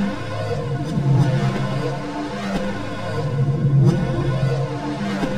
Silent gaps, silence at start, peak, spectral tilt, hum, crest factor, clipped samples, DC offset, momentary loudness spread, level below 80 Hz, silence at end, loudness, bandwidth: none; 0 s; -4 dBFS; -7.5 dB/octave; none; 16 dB; under 0.1%; 1%; 9 LU; -40 dBFS; 0 s; -21 LUFS; 10 kHz